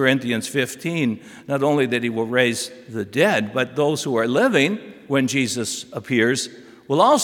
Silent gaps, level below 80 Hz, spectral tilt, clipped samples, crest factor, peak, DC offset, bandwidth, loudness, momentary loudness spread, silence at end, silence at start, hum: none; -70 dBFS; -4.5 dB/octave; under 0.1%; 18 dB; -2 dBFS; under 0.1%; 18 kHz; -21 LUFS; 9 LU; 0 s; 0 s; none